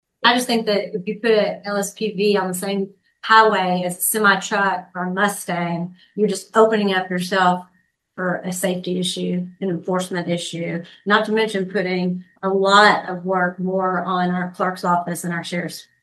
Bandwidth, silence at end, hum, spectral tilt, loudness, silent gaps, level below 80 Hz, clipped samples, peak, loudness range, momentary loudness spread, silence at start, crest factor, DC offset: 13 kHz; 0.2 s; none; -4 dB/octave; -20 LUFS; none; -70 dBFS; under 0.1%; 0 dBFS; 4 LU; 11 LU; 0.2 s; 20 dB; under 0.1%